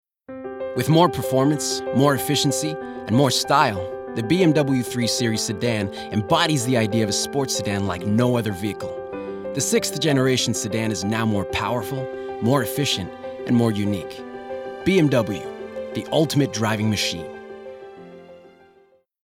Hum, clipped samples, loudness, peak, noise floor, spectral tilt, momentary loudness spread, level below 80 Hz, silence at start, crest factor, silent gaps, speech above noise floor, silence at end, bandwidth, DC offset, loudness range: none; under 0.1%; -21 LUFS; -2 dBFS; -57 dBFS; -4.5 dB/octave; 14 LU; -54 dBFS; 0.3 s; 20 dB; none; 37 dB; 0.8 s; 17 kHz; under 0.1%; 4 LU